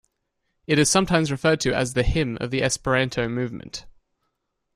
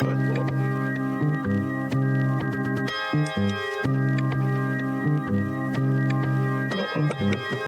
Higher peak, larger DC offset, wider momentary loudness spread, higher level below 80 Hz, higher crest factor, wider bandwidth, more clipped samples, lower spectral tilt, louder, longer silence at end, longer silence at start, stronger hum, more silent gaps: first, -4 dBFS vs -10 dBFS; neither; first, 12 LU vs 3 LU; first, -38 dBFS vs -58 dBFS; about the same, 20 dB vs 16 dB; first, 14 kHz vs 9.6 kHz; neither; second, -4 dB/octave vs -7.5 dB/octave; first, -22 LUFS vs -25 LUFS; first, 0.85 s vs 0 s; first, 0.7 s vs 0 s; neither; neither